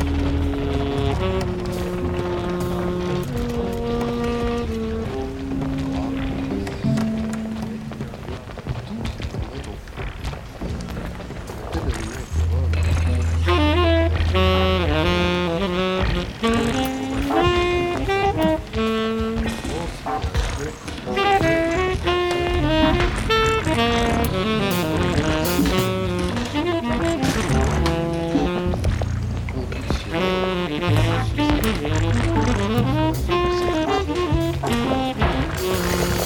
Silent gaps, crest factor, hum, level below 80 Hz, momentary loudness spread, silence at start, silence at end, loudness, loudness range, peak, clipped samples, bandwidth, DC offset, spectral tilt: none; 16 dB; none; -30 dBFS; 11 LU; 0 s; 0 s; -22 LUFS; 7 LU; -4 dBFS; under 0.1%; 18 kHz; under 0.1%; -6 dB/octave